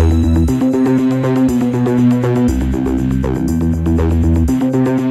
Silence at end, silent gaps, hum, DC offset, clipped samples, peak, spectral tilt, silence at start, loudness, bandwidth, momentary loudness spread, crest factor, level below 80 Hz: 0 s; none; none; under 0.1%; under 0.1%; 0 dBFS; -8.5 dB/octave; 0 s; -14 LUFS; 13.5 kHz; 4 LU; 12 dB; -22 dBFS